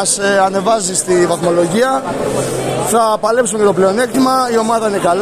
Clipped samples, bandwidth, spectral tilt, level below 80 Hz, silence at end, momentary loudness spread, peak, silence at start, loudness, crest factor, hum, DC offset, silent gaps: under 0.1%; 14.5 kHz; -4 dB/octave; -46 dBFS; 0 s; 5 LU; 0 dBFS; 0 s; -13 LUFS; 12 dB; none; under 0.1%; none